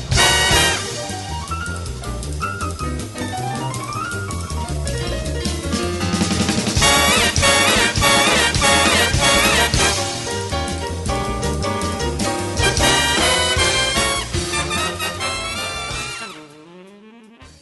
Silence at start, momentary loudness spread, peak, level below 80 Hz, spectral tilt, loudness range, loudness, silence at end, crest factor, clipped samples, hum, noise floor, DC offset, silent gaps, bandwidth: 0 s; 13 LU; 0 dBFS; -30 dBFS; -2.5 dB/octave; 11 LU; -17 LUFS; 0.1 s; 18 dB; under 0.1%; none; -44 dBFS; under 0.1%; none; 12 kHz